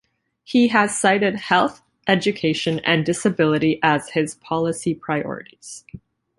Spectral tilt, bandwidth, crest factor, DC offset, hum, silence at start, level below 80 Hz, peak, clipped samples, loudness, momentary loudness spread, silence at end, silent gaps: -4.5 dB/octave; 11.5 kHz; 20 dB; under 0.1%; none; 0.5 s; -58 dBFS; -2 dBFS; under 0.1%; -20 LUFS; 13 LU; 0.4 s; none